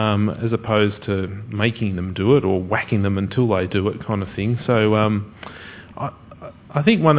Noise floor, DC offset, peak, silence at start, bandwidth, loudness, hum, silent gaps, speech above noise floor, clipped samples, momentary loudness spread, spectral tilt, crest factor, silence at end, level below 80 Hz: -39 dBFS; under 0.1%; 0 dBFS; 0 s; 4 kHz; -21 LUFS; none; none; 20 dB; under 0.1%; 18 LU; -11 dB/octave; 20 dB; 0 s; -42 dBFS